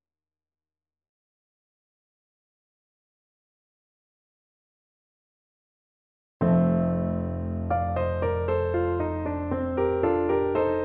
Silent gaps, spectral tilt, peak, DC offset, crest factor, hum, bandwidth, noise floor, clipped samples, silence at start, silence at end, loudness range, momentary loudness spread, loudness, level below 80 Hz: none; -12 dB/octave; -10 dBFS; under 0.1%; 18 dB; none; 4 kHz; under -90 dBFS; under 0.1%; 6.4 s; 0 s; 4 LU; 7 LU; -26 LUFS; -46 dBFS